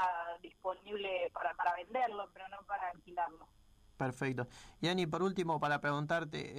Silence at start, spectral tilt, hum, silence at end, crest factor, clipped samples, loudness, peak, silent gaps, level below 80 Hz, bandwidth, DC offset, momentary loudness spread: 0 s; -5.5 dB/octave; none; 0 s; 16 dB; under 0.1%; -38 LUFS; -22 dBFS; none; -68 dBFS; 14.5 kHz; under 0.1%; 9 LU